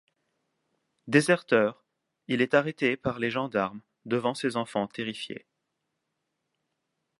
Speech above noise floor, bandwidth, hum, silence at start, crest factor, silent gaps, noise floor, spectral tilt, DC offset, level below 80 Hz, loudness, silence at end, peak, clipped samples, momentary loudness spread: 54 dB; 11.5 kHz; none; 1.05 s; 24 dB; none; -81 dBFS; -5.5 dB/octave; under 0.1%; -68 dBFS; -27 LUFS; 1.8 s; -6 dBFS; under 0.1%; 11 LU